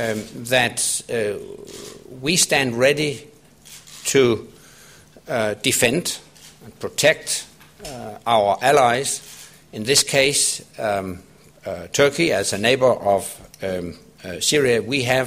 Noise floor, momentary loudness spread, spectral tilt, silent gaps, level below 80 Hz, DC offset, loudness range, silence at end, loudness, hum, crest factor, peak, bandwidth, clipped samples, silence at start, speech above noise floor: -47 dBFS; 20 LU; -2.5 dB/octave; none; -54 dBFS; under 0.1%; 3 LU; 0 s; -19 LUFS; none; 20 dB; -2 dBFS; 16 kHz; under 0.1%; 0 s; 27 dB